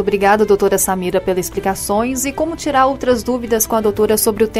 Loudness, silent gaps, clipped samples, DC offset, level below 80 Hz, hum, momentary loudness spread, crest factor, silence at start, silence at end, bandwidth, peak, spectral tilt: -16 LUFS; none; under 0.1%; under 0.1%; -38 dBFS; none; 6 LU; 14 dB; 0 s; 0 s; 16 kHz; -2 dBFS; -4 dB/octave